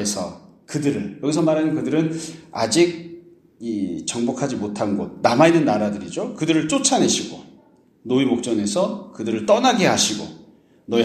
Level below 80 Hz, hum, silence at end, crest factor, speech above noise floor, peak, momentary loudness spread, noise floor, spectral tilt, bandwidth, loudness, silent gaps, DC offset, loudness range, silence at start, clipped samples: -60 dBFS; none; 0 s; 20 dB; 33 dB; 0 dBFS; 14 LU; -53 dBFS; -4 dB/octave; 13.5 kHz; -20 LUFS; none; under 0.1%; 3 LU; 0 s; under 0.1%